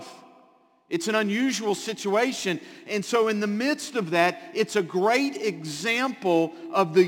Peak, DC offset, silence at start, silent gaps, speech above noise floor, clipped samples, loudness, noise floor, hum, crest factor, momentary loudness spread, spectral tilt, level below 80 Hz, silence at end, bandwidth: -6 dBFS; under 0.1%; 0 s; none; 34 dB; under 0.1%; -25 LUFS; -59 dBFS; none; 18 dB; 7 LU; -4 dB/octave; -76 dBFS; 0 s; 17 kHz